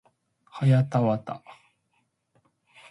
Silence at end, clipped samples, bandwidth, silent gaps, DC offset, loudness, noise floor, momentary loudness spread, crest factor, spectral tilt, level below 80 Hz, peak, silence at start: 1.35 s; under 0.1%; 10.5 kHz; none; under 0.1%; -24 LUFS; -73 dBFS; 19 LU; 18 dB; -9 dB/octave; -66 dBFS; -10 dBFS; 0.55 s